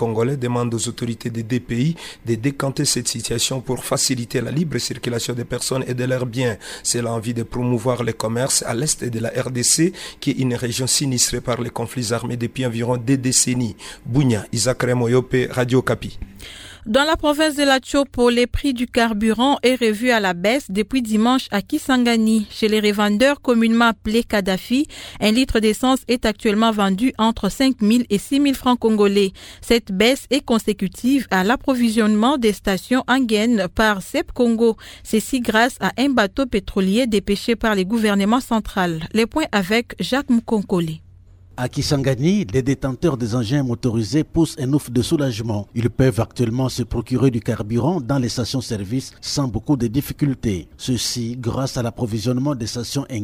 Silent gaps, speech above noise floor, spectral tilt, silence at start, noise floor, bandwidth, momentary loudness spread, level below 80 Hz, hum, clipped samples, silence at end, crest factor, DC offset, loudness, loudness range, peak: none; 26 dB; -4.5 dB/octave; 0 s; -46 dBFS; 18 kHz; 8 LU; -42 dBFS; none; under 0.1%; 0 s; 18 dB; under 0.1%; -19 LUFS; 4 LU; -2 dBFS